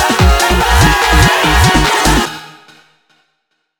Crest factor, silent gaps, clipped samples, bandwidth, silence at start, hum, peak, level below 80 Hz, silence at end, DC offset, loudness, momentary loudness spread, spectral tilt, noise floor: 12 dB; none; under 0.1%; over 20 kHz; 0 s; none; 0 dBFS; -18 dBFS; 1.35 s; under 0.1%; -10 LUFS; 5 LU; -4 dB/octave; -66 dBFS